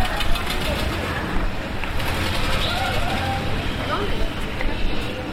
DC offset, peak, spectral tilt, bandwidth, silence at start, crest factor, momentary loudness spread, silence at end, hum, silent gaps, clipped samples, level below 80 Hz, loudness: under 0.1%; -6 dBFS; -4.5 dB/octave; 16 kHz; 0 s; 14 dB; 5 LU; 0 s; none; none; under 0.1%; -26 dBFS; -24 LUFS